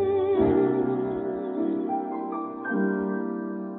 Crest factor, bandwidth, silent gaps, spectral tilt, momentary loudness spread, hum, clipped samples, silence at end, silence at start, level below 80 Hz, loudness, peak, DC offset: 16 dB; 4 kHz; none; -12 dB/octave; 9 LU; none; under 0.1%; 0 s; 0 s; -54 dBFS; -27 LUFS; -10 dBFS; under 0.1%